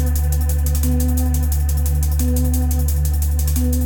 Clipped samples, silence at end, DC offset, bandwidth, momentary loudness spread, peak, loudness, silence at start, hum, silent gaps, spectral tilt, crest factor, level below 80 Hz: under 0.1%; 0 s; under 0.1%; 19 kHz; 1 LU; -6 dBFS; -19 LUFS; 0 s; none; none; -6 dB/octave; 10 dB; -18 dBFS